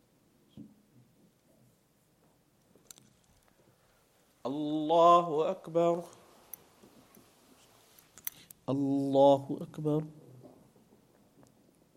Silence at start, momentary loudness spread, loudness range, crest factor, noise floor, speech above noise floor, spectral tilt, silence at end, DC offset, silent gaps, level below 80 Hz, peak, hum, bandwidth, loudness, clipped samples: 0.55 s; 25 LU; 9 LU; 22 dB; -69 dBFS; 41 dB; -7 dB/octave; 1.85 s; under 0.1%; none; -78 dBFS; -12 dBFS; none; 16.5 kHz; -29 LUFS; under 0.1%